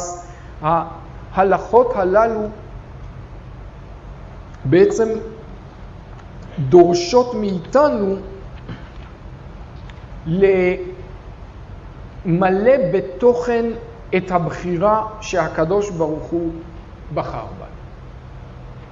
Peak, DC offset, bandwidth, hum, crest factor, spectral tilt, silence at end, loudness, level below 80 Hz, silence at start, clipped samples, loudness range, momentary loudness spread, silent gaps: 0 dBFS; under 0.1%; 8 kHz; none; 18 dB; -6.5 dB/octave; 0 s; -18 LUFS; -38 dBFS; 0 s; under 0.1%; 5 LU; 23 LU; none